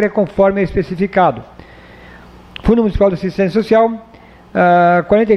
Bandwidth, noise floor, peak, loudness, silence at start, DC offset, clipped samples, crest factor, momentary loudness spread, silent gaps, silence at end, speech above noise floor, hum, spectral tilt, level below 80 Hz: 6.8 kHz; -38 dBFS; 0 dBFS; -14 LUFS; 0 s; under 0.1%; under 0.1%; 14 dB; 9 LU; none; 0 s; 26 dB; none; -8.5 dB/octave; -34 dBFS